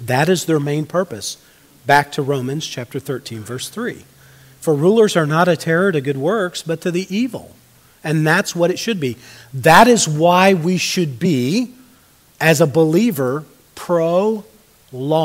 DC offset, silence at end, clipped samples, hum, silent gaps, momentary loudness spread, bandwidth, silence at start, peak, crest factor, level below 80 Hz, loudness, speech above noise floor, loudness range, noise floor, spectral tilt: under 0.1%; 0 s; under 0.1%; none; none; 15 LU; 16 kHz; 0 s; 0 dBFS; 18 dB; -56 dBFS; -17 LUFS; 34 dB; 7 LU; -51 dBFS; -5 dB/octave